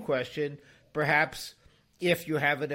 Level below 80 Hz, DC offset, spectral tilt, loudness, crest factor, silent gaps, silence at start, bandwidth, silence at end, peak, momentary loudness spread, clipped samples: -64 dBFS; under 0.1%; -5 dB/octave; -29 LUFS; 20 dB; none; 0 s; 16.5 kHz; 0 s; -10 dBFS; 15 LU; under 0.1%